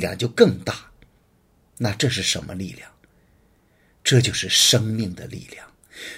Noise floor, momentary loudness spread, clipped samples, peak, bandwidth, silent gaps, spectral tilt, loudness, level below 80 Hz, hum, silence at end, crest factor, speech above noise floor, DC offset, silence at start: -60 dBFS; 21 LU; under 0.1%; 0 dBFS; 16 kHz; none; -3.5 dB/octave; -20 LUFS; -54 dBFS; none; 0 s; 24 dB; 39 dB; under 0.1%; 0 s